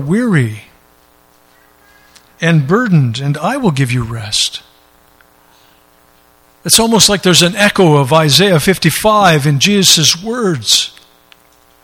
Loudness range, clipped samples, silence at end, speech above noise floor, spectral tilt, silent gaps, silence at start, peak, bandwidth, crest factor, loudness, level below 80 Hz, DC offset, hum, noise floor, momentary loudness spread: 8 LU; 0.1%; 0.95 s; 38 dB; -3.5 dB/octave; none; 0 s; 0 dBFS; over 20 kHz; 14 dB; -10 LUFS; -44 dBFS; under 0.1%; none; -49 dBFS; 10 LU